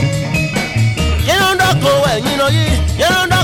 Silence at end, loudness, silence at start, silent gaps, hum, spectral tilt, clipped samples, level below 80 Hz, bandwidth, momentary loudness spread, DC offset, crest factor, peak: 0 s; -13 LUFS; 0 s; none; none; -4.5 dB/octave; under 0.1%; -24 dBFS; 18 kHz; 4 LU; under 0.1%; 12 dB; -2 dBFS